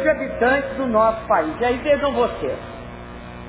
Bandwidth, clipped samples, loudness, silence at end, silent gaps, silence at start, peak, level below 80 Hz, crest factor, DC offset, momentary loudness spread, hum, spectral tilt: 4 kHz; under 0.1%; -20 LUFS; 0 s; none; 0 s; -4 dBFS; -42 dBFS; 16 dB; under 0.1%; 17 LU; 60 Hz at -40 dBFS; -9.5 dB/octave